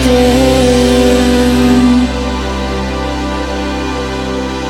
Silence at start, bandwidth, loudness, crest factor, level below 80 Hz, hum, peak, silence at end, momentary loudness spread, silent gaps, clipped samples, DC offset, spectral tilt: 0 s; 16 kHz; -12 LUFS; 12 dB; -20 dBFS; none; 0 dBFS; 0 s; 8 LU; none; under 0.1%; under 0.1%; -5.5 dB/octave